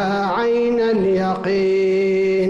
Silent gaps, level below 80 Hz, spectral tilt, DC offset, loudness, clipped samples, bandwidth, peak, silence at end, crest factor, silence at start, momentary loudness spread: none; -52 dBFS; -7 dB/octave; under 0.1%; -18 LUFS; under 0.1%; 7.6 kHz; -10 dBFS; 0 s; 6 dB; 0 s; 2 LU